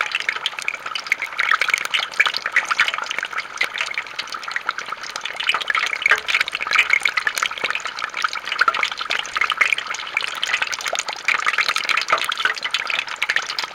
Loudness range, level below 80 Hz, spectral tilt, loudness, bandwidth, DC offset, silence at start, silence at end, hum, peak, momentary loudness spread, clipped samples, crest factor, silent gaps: 3 LU; -64 dBFS; 1.5 dB/octave; -20 LUFS; 17 kHz; under 0.1%; 0 s; 0 s; none; -2 dBFS; 8 LU; under 0.1%; 20 dB; none